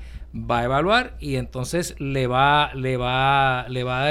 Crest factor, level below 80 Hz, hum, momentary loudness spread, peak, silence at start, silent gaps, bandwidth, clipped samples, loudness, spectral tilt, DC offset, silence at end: 18 dB; -38 dBFS; none; 10 LU; -4 dBFS; 0 s; none; 15 kHz; under 0.1%; -21 LUFS; -5 dB/octave; under 0.1%; 0 s